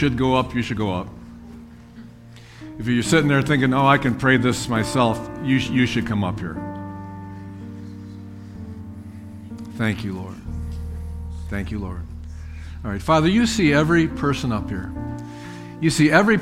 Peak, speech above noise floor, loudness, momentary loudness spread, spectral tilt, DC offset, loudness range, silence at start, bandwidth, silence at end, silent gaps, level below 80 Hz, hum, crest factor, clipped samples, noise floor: 0 dBFS; 23 dB; -21 LUFS; 20 LU; -5.5 dB/octave; under 0.1%; 12 LU; 0 s; 15.5 kHz; 0 s; none; -38 dBFS; none; 22 dB; under 0.1%; -43 dBFS